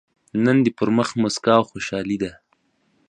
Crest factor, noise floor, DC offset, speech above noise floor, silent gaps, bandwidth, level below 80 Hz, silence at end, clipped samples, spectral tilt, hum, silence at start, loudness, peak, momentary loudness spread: 20 dB; -65 dBFS; under 0.1%; 46 dB; none; 9.8 kHz; -56 dBFS; 0.75 s; under 0.1%; -5.5 dB/octave; none; 0.35 s; -21 LUFS; -2 dBFS; 9 LU